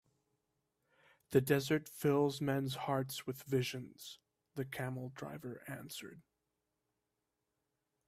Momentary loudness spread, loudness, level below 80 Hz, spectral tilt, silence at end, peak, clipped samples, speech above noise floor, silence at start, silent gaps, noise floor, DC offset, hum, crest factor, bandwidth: 17 LU; -38 LUFS; -74 dBFS; -5.5 dB/octave; 1.85 s; -16 dBFS; under 0.1%; 50 dB; 1.3 s; none; -87 dBFS; under 0.1%; none; 24 dB; 16 kHz